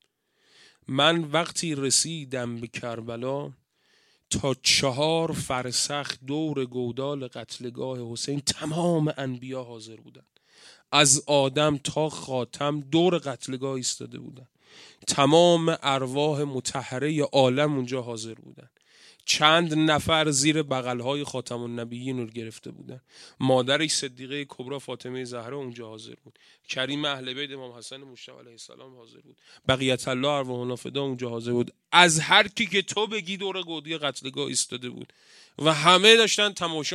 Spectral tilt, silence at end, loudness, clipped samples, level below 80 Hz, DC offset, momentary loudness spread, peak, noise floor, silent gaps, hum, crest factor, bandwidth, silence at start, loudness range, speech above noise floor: -3 dB/octave; 0 s; -24 LUFS; under 0.1%; -62 dBFS; under 0.1%; 18 LU; 0 dBFS; -68 dBFS; none; none; 26 dB; 15.5 kHz; 0.9 s; 8 LU; 42 dB